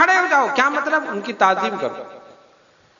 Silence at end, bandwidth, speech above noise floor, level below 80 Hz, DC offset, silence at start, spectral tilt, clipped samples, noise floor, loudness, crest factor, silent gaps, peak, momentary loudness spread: 0.8 s; 7.4 kHz; 34 dB; -70 dBFS; under 0.1%; 0 s; -3 dB/octave; under 0.1%; -54 dBFS; -18 LUFS; 18 dB; none; -2 dBFS; 12 LU